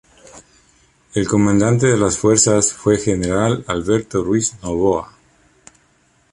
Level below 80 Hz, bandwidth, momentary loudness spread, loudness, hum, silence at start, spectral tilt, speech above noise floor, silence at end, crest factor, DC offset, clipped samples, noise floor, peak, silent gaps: -42 dBFS; 11.5 kHz; 8 LU; -17 LUFS; none; 0.35 s; -5 dB/octave; 42 dB; 1.25 s; 16 dB; under 0.1%; under 0.1%; -58 dBFS; -2 dBFS; none